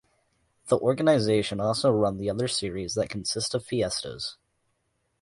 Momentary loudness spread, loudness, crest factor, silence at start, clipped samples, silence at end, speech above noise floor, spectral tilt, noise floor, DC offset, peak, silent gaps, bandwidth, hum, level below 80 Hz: 9 LU; -26 LUFS; 18 dB; 0.65 s; under 0.1%; 0.85 s; 49 dB; -4.5 dB/octave; -75 dBFS; under 0.1%; -10 dBFS; none; 11.5 kHz; none; -56 dBFS